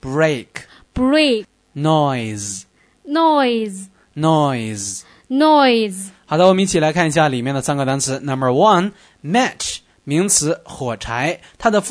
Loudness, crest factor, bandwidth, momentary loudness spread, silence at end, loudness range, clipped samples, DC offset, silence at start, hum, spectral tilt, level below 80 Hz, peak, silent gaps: -17 LUFS; 16 dB; 11 kHz; 14 LU; 0 s; 3 LU; under 0.1%; under 0.1%; 0 s; none; -4.5 dB/octave; -46 dBFS; 0 dBFS; none